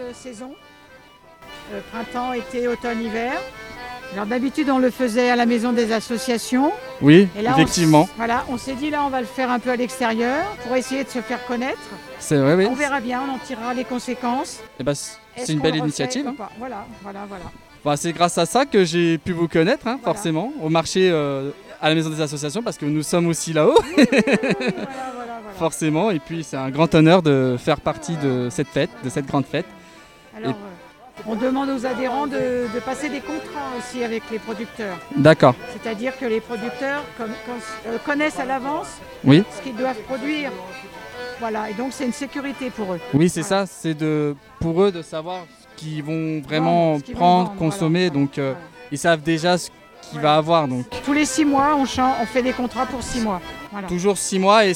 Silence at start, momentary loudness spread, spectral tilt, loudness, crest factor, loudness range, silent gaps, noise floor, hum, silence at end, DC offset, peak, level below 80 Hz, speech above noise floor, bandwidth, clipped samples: 0 s; 16 LU; -5.5 dB/octave; -21 LUFS; 20 dB; 8 LU; none; -47 dBFS; none; 0 s; under 0.1%; 0 dBFS; -50 dBFS; 27 dB; 16.5 kHz; under 0.1%